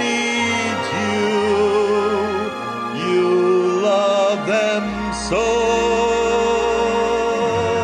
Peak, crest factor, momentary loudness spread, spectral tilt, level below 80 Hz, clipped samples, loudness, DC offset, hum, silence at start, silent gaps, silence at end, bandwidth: -6 dBFS; 10 dB; 6 LU; -4 dB/octave; -42 dBFS; under 0.1%; -18 LUFS; under 0.1%; none; 0 s; none; 0 s; 11.5 kHz